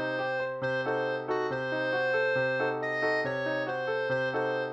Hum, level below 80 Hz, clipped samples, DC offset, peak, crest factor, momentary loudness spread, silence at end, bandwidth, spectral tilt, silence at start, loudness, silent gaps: none; -70 dBFS; under 0.1%; under 0.1%; -16 dBFS; 14 dB; 4 LU; 0 s; 7.8 kHz; -6 dB/octave; 0 s; -30 LUFS; none